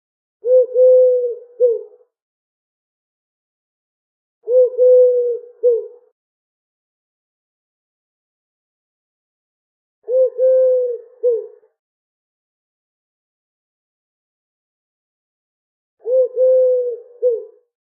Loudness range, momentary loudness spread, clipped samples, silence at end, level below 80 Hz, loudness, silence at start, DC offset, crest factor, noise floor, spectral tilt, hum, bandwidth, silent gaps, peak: 9 LU; 13 LU; under 0.1%; 0.4 s; under -90 dBFS; -16 LUFS; 0.45 s; under 0.1%; 14 dB; under -90 dBFS; -6 dB/octave; none; 1.6 kHz; 2.22-4.41 s, 6.12-10.02 s, 11.79-15.97 s; -4 dBFS